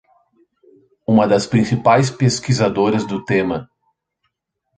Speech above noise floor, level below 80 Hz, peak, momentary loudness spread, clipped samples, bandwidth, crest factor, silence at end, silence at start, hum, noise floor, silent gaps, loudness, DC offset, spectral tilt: 58 dB; -52 dBFS; -2 dBFS; 7 LU; under 0.1%; 9.4 kHz; 16 dB; 1.15 s; 1.1 s; none; -74 dBFS; none; -17 LUFS; under 0.1%; -6 dB/octave